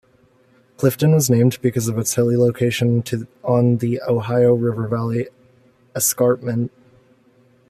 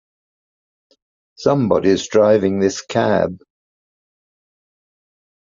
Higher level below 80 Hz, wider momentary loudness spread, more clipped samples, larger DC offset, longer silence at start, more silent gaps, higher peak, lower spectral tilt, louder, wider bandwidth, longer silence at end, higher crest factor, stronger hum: about the same, -56 dBFS vs -58 dBFS; first, 9 LU vs 6 LU; neither; neither; second, 0.8 s vs 1.4 s; neither; about the same, -2 dBFS vs -2 dBFS; about the same, -6 dB/octave vs -5.5 dB/octave; about the same, -19 LUFS vs -17 LUFS; first, 15 kHz vs 7.6 kHz; second, 1 s vs 2.1 s; about the same, 16 dB vs 18 dB; neither